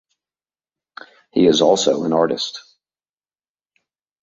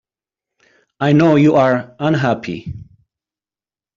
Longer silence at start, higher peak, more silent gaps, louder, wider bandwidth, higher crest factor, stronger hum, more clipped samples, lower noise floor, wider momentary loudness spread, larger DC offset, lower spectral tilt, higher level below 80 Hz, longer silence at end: first, 1.35 s vs 1 s; about the same, -2 dBFS vs -2 dBFS; neither; second, -17 LUFS vs -14 LUFS; first, 8.2 kHz vs 7.4 kHz; first, 20 dB vs 14 dB; neither; neither; about the same, under -90 dBFS vs under -90 dBFS; second, 12 LU vs 17 LU; neither; second, -4 dB/octave vs -8 dB/octave; second, -62 dBFS vs -52 dBFS; first, 1.65 s vs 1.15 s